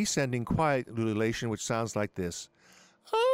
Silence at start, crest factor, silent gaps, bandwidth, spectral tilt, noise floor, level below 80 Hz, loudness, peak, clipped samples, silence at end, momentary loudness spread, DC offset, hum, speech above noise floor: 0 s; 16 dB; none; 16 kHz; -5 dB/octave; -60 dBFS; -54 dBFS; -31 LUFS; -14 dBFS; under 0.1%; 0 s; 9 LU; under 0.1%; none; 30 dB